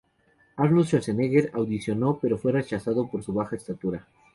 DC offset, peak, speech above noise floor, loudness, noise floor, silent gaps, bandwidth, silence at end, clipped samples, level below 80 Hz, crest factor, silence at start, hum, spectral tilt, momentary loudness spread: under 0.1%; -8 dBFS; 39 dB; -26 LUFS; -64 dBFS; none; 11.5 kHz; 0.35 s; under 0.1%; -58 dBFS; 18 dB; 0.55 s; none; -8 dB/octave; 10 LU